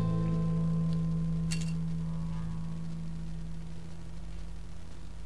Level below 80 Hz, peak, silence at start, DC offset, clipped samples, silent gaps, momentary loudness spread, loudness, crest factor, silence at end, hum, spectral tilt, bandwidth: -44 dBFS; -20 dBFS; 0 s; 1%; under 0.1%; none; 15 LU; -34 LUFS; 14 dB; 0 s; none; -7.5 dB/octave; 12 kHz